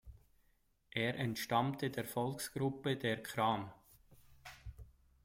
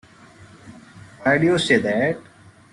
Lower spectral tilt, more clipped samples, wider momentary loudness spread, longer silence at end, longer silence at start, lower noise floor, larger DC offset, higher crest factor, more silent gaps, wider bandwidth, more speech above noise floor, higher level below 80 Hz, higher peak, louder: about the same, -5 dB/octave vs -5 dB/octave; neither; first, 18 LU vs 8 LU; second, 0.35 s vs 0.5 s; second, 0.05 s vs 0.4 s; first, -74 dBFS vs -47 dBFS; neither; about the same, 20 dB vs 18 dB; neither; first, 16.5 kHz vs 11.5 kHz; first, 37 dB vs 28 dB; second, -64 dBFS vs -58 dBFS; second, -20 dBFS vs -4 dBFS; second, -38 LUFS vs -19 LUFS